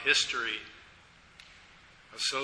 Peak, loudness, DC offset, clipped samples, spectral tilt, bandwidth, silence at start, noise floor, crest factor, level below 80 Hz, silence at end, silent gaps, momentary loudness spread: -12 dBFS; -30 LUFS; under 0.1%; under 0.1%; 0.5 dB/octave; 11 kHz; 0 s; -58 dBFS; 22 dB; -66 dBFS; 0 s; none; 27 LU